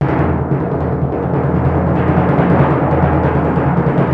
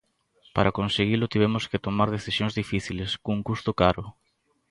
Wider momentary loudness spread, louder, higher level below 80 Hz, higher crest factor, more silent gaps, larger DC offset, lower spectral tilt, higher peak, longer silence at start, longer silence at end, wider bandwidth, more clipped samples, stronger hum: about the same, 5 LU vs 7 LU; first, -14 LUFS vs -26 LUFS; first, -28 dBFS vs -46 dBFS; second, 14 dB vs 22 dB; neither; neither; first, -11 dB/octave vs -6 dB/octave; first, 0 dBFS vs -4 dBFS; second, 0 s vs 0.55 s; second, 0 s vs 0.6 s; second, 4.5 kHz vs 11.5 kHz; neither; neither